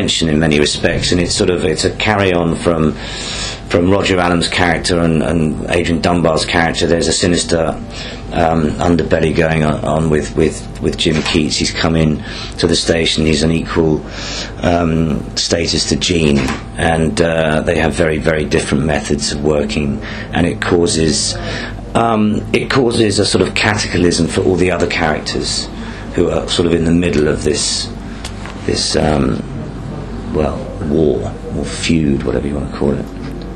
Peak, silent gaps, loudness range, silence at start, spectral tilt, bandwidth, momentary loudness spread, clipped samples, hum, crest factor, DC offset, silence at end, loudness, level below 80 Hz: 0 dBFS; none; 3 LU; 0 s; -4.5 dB/octave; 11 kHz; 9 LU; under 0.1%; none; 14 dB; under 0.1%; 0 s; -15 LUFS; -28 dBFS